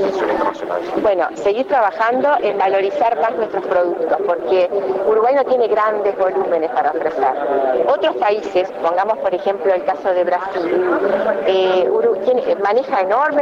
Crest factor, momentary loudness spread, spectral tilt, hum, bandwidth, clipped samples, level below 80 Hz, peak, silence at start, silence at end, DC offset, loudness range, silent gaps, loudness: 12 dB; 4 LU; -5.5 dB/octave; none; 7.6 kHz; under 0.1%; -58 dBFS; -6 dBFS; 0 s; 0 s; under 0.1%; 1 LU; none; -17 LUFS